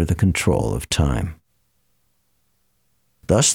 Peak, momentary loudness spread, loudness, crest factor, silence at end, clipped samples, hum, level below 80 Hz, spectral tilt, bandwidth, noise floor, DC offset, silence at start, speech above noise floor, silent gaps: -4 dBFS; 11 LU; -20 LUFS; 18 dB; 0 s; under 0.1%; none; -34 dBFS; -4.5 dB/octave; 16.5 kHz; -68 dBFS; under 0.1%; 0 s; 49 dB; none